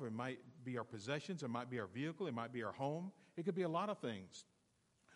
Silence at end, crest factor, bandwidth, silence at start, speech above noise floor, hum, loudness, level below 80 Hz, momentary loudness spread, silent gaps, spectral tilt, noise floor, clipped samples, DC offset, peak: 0 s; 18 dB; 11.5 kHz; 0 s; 34 dB; none; -45 LUFS; -90 dBFS; 10 LU; none; -6 dB/octave; -78 dBFS; under 0.1%; under 0.1%; -26 dBFS